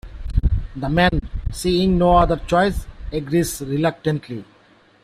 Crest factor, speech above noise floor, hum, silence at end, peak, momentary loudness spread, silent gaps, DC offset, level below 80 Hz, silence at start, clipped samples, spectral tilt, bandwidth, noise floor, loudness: 18 dB; 35 dB; none; 0.6 s; -2 dBFS; 14 LU; none; under 0.1%; -28 dBFS; 0.05 s; under 0.1%; -6 dB/octave; 15.5 kHz; -53 dBFS; -20 LUFS